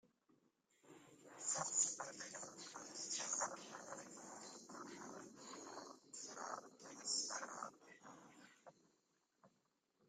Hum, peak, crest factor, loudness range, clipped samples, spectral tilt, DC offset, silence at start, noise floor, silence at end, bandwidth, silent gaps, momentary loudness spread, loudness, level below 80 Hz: none; -26 dBFS; 24 dB; 8 LU; under 0.1%; -0.5 dB/octave; under 0.1%; 0.05 s; -84 dBFS; 0.6 s; 15 kHz; none; 22 LU; -46 LUFS; under -90 dBFS